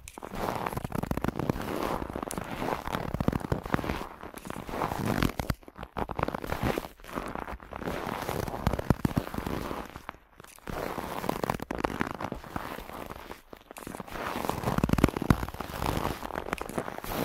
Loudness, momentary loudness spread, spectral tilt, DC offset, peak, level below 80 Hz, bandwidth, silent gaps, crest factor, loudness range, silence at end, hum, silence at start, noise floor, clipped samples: -33 LUFS; 13 LU; -6 dB/octave; under 0.1%; -4 dBFS; -42 dBFS; 16 kHz; none; 28 dB; 4 LU; 0 s; none; 0 s; -53 dBFS; under 0.1%